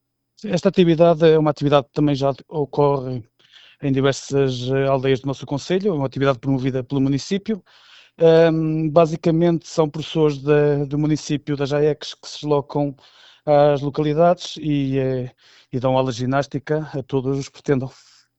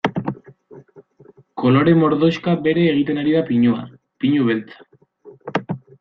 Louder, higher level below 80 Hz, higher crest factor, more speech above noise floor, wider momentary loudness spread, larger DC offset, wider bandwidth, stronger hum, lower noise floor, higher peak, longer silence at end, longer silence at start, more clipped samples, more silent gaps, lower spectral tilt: about the same, -20 LUFS vs -18 LUFS; first, -50 dBFS vs -58 dBFS; about the same, 18 dB vs 16 dB; about the same, 32 dB vs 33 dB; second, 11 LU vs 16 LU; neither; first, 8.2 kHz vs 6.6 kHz; neither; about the same, -51 dBFS vs -49 dBFS; about the same, -2 dBFS vs -2 dBFS; first, 0.5 s vs 0.25 s; first, 0.45 s vs 0.05 s; neither; neither; second, -7 dB/octave vs -8.5 dB/octave